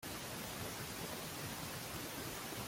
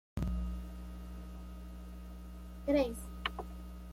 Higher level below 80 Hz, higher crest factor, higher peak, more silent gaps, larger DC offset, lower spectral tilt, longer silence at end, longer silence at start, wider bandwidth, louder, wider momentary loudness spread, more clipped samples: second, -64 dBFS vs -44 dBFS; second, 14 dB vs 22 dB; second, -32 dBFS vs -18 dBFS; neither; neither; second, -3 dB/octave vs -6.5 dB/octave; about the same, 0 s vs 0 s; second, 0 s vs 0.15 s; about the same, 16.5 kHz vs 16 kHz; second, -44 LUFS vs -40 LUFS; second, 0 LU vs 17 LU; neither